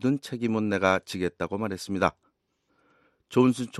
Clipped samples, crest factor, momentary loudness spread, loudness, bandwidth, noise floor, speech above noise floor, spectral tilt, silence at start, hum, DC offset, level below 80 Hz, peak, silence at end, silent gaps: under 0.1%; 22 dB; 8 LU; -27 LUFS; 12.5 kHz; -73 dBFS; 47 dB; -6 dB/octave; 0 s; none; under 0.1%; -60 dBFS; -6 dBFS; 0 s; none